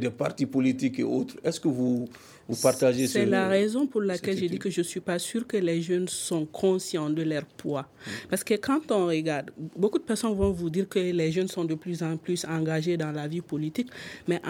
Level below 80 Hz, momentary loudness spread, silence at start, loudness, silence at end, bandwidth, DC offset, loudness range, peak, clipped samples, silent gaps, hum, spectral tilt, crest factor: -54 dBFS; 9 LU; 0 s; -28 LUFS; 0 s; 17 kHz; under 0.1%; 3 LU; -8 dBFS; under 0.1%; none; none; -5.5 dB/octave; 20 dB